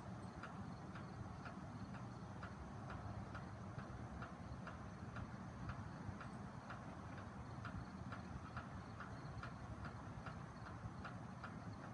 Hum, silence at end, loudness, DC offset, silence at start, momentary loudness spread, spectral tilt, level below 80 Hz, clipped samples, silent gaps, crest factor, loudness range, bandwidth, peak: none; 0 s; -52 LUFS; under 0.1%; 0 s; 2 LU; -7 dB/octave; -64 dBFS; under 0.1%; none; 18 dB; 0 LU; 11 kHz; -34 dBFS